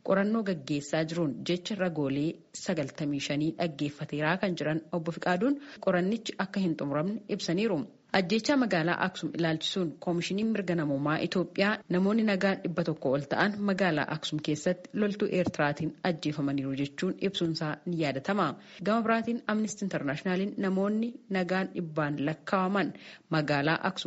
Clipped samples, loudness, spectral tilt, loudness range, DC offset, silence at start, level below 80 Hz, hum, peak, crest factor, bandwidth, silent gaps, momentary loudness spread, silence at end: under 0.1%; -30 LUFS; -4.5 dB/octave; 3 LU; under 0.1%; 0.05 s; -68 dBFS; none; -10 dBFS; 20 dB; 8 kHz; none; 6 LU; 0 s